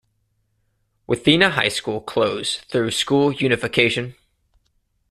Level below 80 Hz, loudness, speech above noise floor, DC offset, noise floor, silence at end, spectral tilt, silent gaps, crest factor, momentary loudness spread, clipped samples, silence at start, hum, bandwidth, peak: -54 dBFS; -19 LUFS; 49 dB; under 0.1%; -68 dBFS; 1 s; -4 dB/octave; none; 22 dB; 10 LU; under 0.1%; 1.1 s; none; 13.5 kHz; 0 dBFS